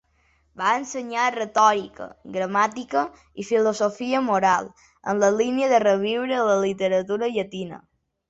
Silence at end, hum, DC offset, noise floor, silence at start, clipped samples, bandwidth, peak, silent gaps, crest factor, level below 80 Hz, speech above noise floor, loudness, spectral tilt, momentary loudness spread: 0.5 s; none; under 0.1%; -64 dBFS; 0.55 s; under 0.1%; 8 kHz; -4 dBFS; none; 18 dB; -64 dBFS; 42 dB; -22 LUFS; -4.5 dB/octave; 13 LU